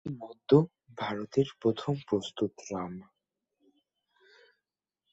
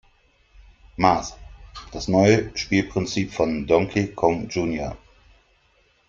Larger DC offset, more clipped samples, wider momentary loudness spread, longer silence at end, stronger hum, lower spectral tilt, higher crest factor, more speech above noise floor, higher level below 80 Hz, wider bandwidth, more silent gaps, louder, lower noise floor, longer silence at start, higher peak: neither; neither; about the same, 16 LU vs 18 LU; first, 2.1 s vs 1.15 s; neither; first, -7 dB/octave vs -5.5 dB/octave; about the same, 24 dB vs 22 dB; first, 56 dB vs 40 dB; second, -66 dBFS vs -46 dBFS; about the same, 8 kHz vs 7.6 kHz; neither; second, -31 LUFS vs -22 LUFS; first, -88 dBFS vs -62 dBFS; second, 0.05 s vs 1 s; second, -8 dBFS vs -2 dBFS